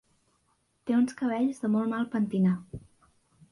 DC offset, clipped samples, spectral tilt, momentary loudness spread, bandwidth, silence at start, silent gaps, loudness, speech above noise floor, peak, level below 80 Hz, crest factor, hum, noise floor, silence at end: under 0.1%; under 0.1%; -8 dB/octave; 14 LU; 11.5 kHz; 0.85 s; none; -28 LUFS; 45 dB; -16 dBFS; -62 dBFS; 14 dB; none; -72 dBFS; 0.75 s